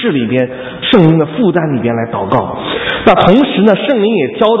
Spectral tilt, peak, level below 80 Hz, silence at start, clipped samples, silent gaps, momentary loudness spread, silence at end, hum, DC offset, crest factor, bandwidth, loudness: -8.5 dB/octave; 0 dBFS; -40 dBFS; 0 s; 0.5%; none; 8 LU; 0 s; none; under 0.1%; 10 dB; 7.2 kHz; -11 LUFS